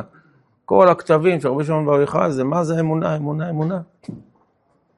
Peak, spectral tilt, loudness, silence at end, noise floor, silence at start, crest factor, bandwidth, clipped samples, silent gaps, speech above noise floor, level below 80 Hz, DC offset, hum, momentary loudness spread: 0 dBFS; -8 dB/octave; -18 LUFS; 0.8 s; -63 dBFS; 0 s; 20 dB; 11 kHz; under 0.1%; none; 45 dB; -60 dBFS; under 0.1%; none; 17 LU